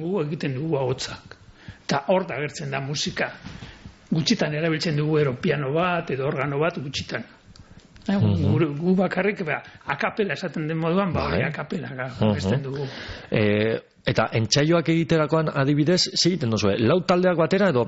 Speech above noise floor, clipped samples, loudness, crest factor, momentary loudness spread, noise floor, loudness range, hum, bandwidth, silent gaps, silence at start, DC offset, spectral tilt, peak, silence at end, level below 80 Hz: 25 dB; under 0.1%; -23 LUFS; 16 dB; 11 LU; -48 dBFS; 5 LU; none; 8 kHz; none; 0 s; under 0.1%; -5 dB/octave; -6 dBFS; 0 s; -52 dBFS